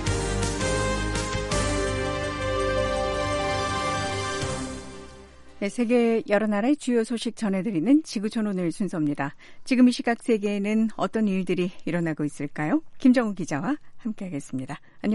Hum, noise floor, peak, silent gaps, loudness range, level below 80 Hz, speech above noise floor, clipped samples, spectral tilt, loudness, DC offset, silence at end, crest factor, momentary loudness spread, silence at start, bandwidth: none; -46 dBFS; -8 dBFS; none; 3 LU; -40 dBFS; 21 dB; under 0.1%; -5.5 dB/octave; -26 LUFS; under 0.1%; 0 s; 16 dB; 11 LU; 0 s; 11.5 kHz